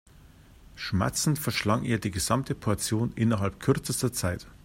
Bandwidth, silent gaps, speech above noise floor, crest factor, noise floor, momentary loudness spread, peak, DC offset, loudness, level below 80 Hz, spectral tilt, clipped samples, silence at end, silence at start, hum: 16 kHz; none; 25 dB; 20 dB; -53 dBFS; 4 LU; -8 dBFS; under 0.1%; -28 LUFS; -50 dBFS; -5 dB/octave; under 0.1%; 0.05 s; 0.25 s; none